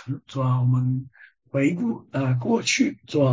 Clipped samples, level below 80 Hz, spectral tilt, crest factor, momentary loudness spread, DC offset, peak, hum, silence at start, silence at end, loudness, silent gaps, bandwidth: under 0.1%; -60 dBFS; -6 dB/octave; 16 dB; 7 LU; under 0.1%; -8 dBFS; none; 0.05 s; 0 s; -24 LUFS; none; 7.6 kHz